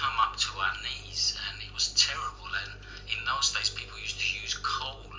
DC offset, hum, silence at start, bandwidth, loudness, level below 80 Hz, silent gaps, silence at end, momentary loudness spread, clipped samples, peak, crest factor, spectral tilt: under 0.1%; 50 Hz at -50 dBFS; 0 s; 7.8 kHz; -29 LUFS; -48 dBFS; none; 0 s; 10 LU; under 0.1%; -8 dBFS; 24 dB; 0.5 dB/octave